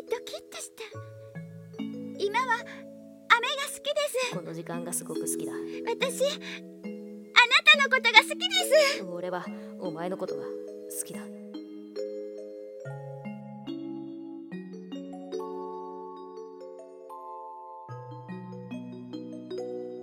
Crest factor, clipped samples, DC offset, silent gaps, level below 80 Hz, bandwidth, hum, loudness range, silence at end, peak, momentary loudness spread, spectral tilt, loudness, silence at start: 30 dB; under 0.1%; under 0.1%; none; -82 dBFS; 17 kHz; none; 19 LU; 0 s; 0 dBFS; 23 LU; -2.5 dB/octave; -26 LUFS; 0 s